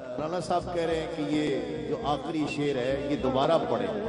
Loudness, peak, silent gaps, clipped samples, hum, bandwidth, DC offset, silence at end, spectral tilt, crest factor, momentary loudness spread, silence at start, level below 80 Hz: -29 LUFS; -12 dBFS; none; under 0.1%; none; 11 kHz; under 0.1%; 0 s; -6 dB/octave; 16 dB; 7 LU; 0 s; -50 dBFS